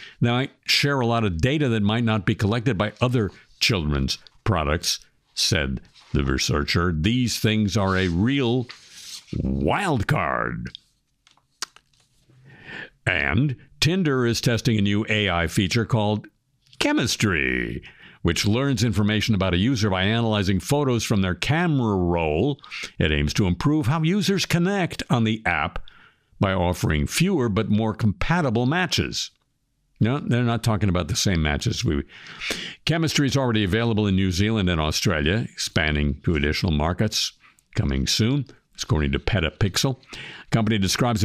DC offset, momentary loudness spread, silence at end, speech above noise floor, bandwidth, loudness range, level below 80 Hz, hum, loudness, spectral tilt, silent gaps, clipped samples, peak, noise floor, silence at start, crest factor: under 0.1%; 8 LU; 0 s; 48 dB; 15.5 kHz; 3 LU; -38 dBFS; none; -22 LUFS; -5 dB/octave; none; under 0.1%; -4 dBFS; -70 dBFS; 0 s; 18 dB